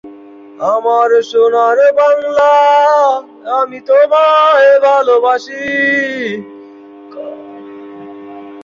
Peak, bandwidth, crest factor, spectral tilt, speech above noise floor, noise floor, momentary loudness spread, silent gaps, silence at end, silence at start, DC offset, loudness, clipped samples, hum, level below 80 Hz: -2 dBFS; 7.4 kHz; 10 dB; -3.5 dB/octave; 25 dB; -35 dBFS; 23 LU; none; 0 s; 0.05 s; under 0.1%; -10 LUFS; under 0.1%; none; -62 dBFS